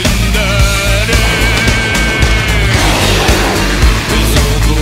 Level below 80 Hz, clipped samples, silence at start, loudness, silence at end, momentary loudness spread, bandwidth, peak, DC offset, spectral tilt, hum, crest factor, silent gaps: -14 dBFS; under 0.1%; 0 s; -10 LUFS; 0 s; 2 LU; 16.5 kHz; 0 dBFS; under 0.1%; -4 dB/octave; none; 10 dB; none